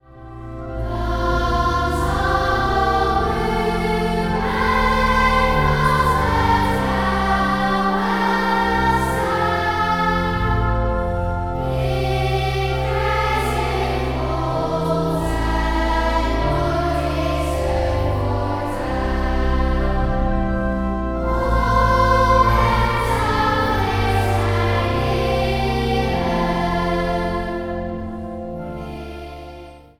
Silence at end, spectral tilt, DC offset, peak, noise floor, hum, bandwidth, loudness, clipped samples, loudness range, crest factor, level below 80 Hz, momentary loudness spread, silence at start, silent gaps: 0.2 s; -6 dB/octave; under 0.1%; -2 dBFS; -39 dBFS; none; 17 kHz; -20 LUFS; under 0.1%; 4 LU; 18 dB; -26 dBFS; 8 LU; 0.15 s; none